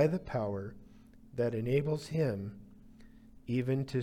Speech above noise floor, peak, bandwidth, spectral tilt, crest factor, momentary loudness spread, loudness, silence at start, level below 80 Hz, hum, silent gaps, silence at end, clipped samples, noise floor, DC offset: 23 dB; -16 dBFS; 14 kHz; -8 dB/octave; 18 dB; 15 LU; -34 LUFS; 0 s; -60 dBFS; none; none; 0 s; under 0.1%; -56 dBFS; under 0.1%